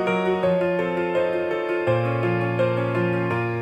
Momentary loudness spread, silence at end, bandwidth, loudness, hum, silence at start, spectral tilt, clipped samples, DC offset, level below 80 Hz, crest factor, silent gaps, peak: 2 LU; 0 s; 8.6 kHz; -23 LUFS; none; 0 s; -8 dB/octave; under 0.1%; under 0.1%; -62 dBFS; 14 dB; none; -10 dBFS